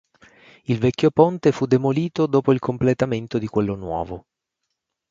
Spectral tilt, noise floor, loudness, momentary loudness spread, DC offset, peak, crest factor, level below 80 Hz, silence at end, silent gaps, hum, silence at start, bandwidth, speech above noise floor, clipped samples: -8 dB/octave; -79 dBFS; -21 LUFS; 11 LU; under 0.1%; 0 dBFS; 20 dB; -50 dBFS; 0.9 s; none; none; 0.7 s; 7.6 kHz; 59 dB; under 0.1%